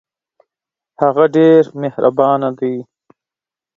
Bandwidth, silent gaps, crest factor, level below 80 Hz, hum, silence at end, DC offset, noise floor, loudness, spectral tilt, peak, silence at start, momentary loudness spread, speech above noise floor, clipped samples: 7.2 kHz; none; 16 dB; -62 dBFS; none; 0.95 s; under 0.1%; -89 dBFS; -14 LUFS; -8.5 dB/octave; 0 dBFS; 1 s; 12 LU; 76 dB; under 0.1%